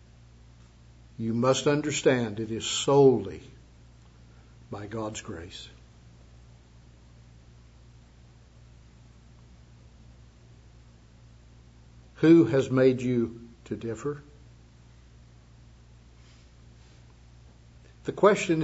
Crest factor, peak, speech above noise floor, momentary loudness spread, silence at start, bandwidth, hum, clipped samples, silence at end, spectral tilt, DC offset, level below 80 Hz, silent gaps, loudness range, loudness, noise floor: 24 dB; -6 dBFS; 29 dB; 23 LU; 1.2 s; 8 kHz; none; under 0.1%; 0 s; -5.5 dB/octave; under 0.1%; -56 dBFS; none; 17 LU; -25 LUFS; -54 dBFS